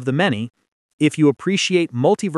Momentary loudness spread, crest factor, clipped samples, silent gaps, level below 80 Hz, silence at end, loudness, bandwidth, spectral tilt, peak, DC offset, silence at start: 6 LU; 16 dB; under 0.1%; 0.68-0.98 s; -68 dBFS; 0 s; -18 LUFS; 12 kHz; -5.5 dB/octave; -4 dBFS; under 0.1%; 0 s